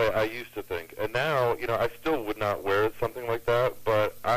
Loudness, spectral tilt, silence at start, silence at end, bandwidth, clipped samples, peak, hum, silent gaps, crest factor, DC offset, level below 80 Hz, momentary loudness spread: -28 LUFS; -5.5 dB/octave; 0 s; 0 s; 15.5 kHz; under 0.1%; -14 dBFS; none; none; 14 dB; under 0.1%; -50 dBFS; 7 LU